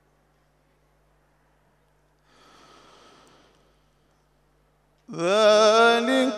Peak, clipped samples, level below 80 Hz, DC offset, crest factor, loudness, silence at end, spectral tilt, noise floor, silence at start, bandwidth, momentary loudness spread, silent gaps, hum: -6 dBFS; under 0.1%; -70 dBFS; under 0.1%; 18 dB; -18 LUFS; 0 s; -3 dB/octave; -65 dBFS; 5.1 s; 12.5 kHz; 12 LU; none; 50 Hz at -70 dBFS